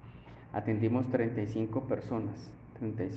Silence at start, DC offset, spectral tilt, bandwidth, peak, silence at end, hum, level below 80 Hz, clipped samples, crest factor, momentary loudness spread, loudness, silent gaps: 0 s; under 0.1%; -9.5 dB/octave; 6.6 kHz; -16 dBFS; 0 s; none; -60 dBFS; under 0.1%; 18 dB; 17 LU; -34 LUFS; none